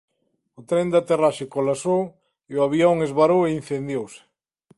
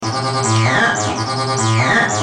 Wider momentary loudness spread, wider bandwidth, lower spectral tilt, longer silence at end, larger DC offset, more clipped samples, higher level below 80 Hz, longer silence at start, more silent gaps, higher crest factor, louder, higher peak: first, 11 LU vs 5 LU; about the same, 11.5 kHz vs 10.5 kHz; first, -6.5 dB/octave vs -4 dB/octave; first, 0.6 s vs 0 s; neither; neither; second, -60 dBFS vs -50 dBFS; first, 0.6 s vs 0 s; neither; about the same, 16 dB vs 14 dB; second, -21 LUFS vs -15 LUFS; second, -6 dBFS vs -2 dBFS